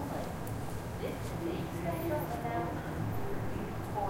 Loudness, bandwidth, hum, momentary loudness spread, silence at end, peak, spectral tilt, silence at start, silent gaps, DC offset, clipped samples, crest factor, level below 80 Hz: -37 LUFS; 16 kHz; none; 4 LU; 0 s; -22 dBFS; -6.5 dB/octave; 0 s; none; under 0.1%; under 0.1%; 14 dB; -48 dBFS